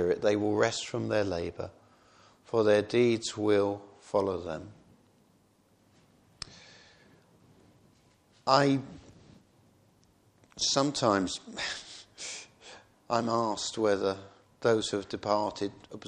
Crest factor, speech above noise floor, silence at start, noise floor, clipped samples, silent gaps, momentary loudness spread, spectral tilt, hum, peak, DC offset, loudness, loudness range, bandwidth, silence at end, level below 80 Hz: 24 dB; 37 dB; 0 s; -66 dBFS; under 0.1%; none; 18 LU; -4.5 dB/octave; none; -8 dBFS; under 0.1%; -29 LUFS; 5 LU; 10.5 kHz; 0 s; -66 dBFS